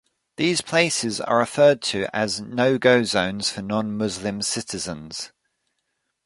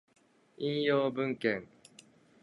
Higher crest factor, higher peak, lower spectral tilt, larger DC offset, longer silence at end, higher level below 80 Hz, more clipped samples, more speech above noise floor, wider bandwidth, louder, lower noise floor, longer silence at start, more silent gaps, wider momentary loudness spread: about the same, 20 dB vs 18 dB; first, -2 dBFS vs -16 dBFS; second, -3.5 dB/octave vs -6.5 dB/octave; neither; first, 1 s vs 0.8 s; first, -58 dBFS vs -76 dBFS; neither; first, 54 dB vs 29 dB; about the same, 11.5 kHz vs 11.5 kHz; first, -22 LUFS vs -32 LUFS; first, -76 dBFS vs -60 dBFS; second, 0.4 s vs 0.6 s; neither; first, 12 LU vs 9 LU